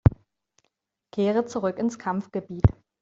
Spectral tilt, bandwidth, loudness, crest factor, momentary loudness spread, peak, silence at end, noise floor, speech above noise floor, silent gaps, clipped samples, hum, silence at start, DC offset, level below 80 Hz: -8.5 dB/octave; 7.8 kHz; -26 LUFS; 22 dB; 7 LU; -4 dBFS; 0.3 s; -76 dBFS; 51 dB; none; under 0.1%; none; 0.05 s; under 0.1%; -40 dBFS